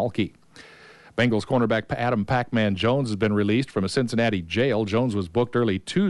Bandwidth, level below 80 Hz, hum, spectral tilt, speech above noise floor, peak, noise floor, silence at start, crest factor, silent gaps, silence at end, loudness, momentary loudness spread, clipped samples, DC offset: 11.5 kHz; -54 dBFS; none; -6.5 dB/octave; 26 dB; -10 dBFS; -49 dBFS; 0 s; 14 dB; none; 0 s; -24 LUFS; 3 LU; under 0.1%; under 0.1%